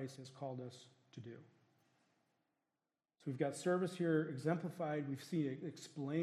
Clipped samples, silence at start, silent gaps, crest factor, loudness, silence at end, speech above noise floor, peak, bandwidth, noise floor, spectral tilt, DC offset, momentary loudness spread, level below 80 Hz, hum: under 0.1%; 0 s; none; 20 dB; -41 LUFS; 0 s; over 49 dB; -22 dBFS; 14 kHz; under -90 dBFS; -6.5 dB/octave; under 0.1%; 18 LU; -90 dBFS; none